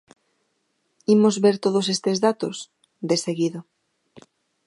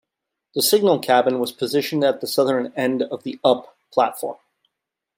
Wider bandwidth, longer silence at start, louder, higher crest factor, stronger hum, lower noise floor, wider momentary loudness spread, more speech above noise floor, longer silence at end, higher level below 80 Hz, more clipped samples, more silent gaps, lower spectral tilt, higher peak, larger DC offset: second, 11.5 kHz vs 16.5 kHz; first, 1.1 s vs 0.55 s; about the same, -21 LUFS vs -20 LUFS; about the same, 18 dB vs 18 dB; neither; second, -72 dBFS vs -82 dBFS; first, 17 LU vs 9 LU; second, 51 dB vs 63 dB; first, 1.05 s vs 0.85 s; about the same, -72 dBFS vs -72 dBFS; neither; neither; about the same, -5 dB/octave vs -4 dB/octave; second, -6 dBFS vs -2 dBFS; neither